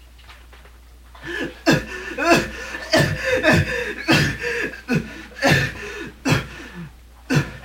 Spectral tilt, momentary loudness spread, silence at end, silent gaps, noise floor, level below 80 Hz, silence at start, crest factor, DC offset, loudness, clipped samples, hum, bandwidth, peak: -5 dB/octave; 16 LU; 0 s; none; -45 dBFS; -40 dBFS; 0 s; 20 dB; under 0.1%; -20 LUFS; under 0.1%; none; 16.5 kHz; -2 dBFS